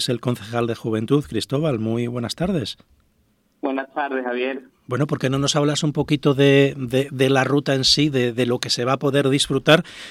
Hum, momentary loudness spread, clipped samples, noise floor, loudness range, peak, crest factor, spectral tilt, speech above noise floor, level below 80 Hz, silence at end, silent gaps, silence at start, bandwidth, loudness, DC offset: none; 10 LU; under 0.1%; -63 dBFS; 7 LU; 0 dBFS; 20 dB; -5 dB/octave; 43 dB; -52 dBFS; 0 s; none; 0 s; 14.5 kHz; -20 LUFS; under 0.1%